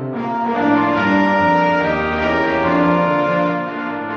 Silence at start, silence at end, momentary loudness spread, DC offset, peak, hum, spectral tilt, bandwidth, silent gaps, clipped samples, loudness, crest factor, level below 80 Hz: 0 s; 0 s; 7 LU; under 0.1%; -2 dBFS; none; -7.5 dB/octave; 6.8 kHz; none; under 0.1%; -16 LUFS; 14 dB; -44 dBFS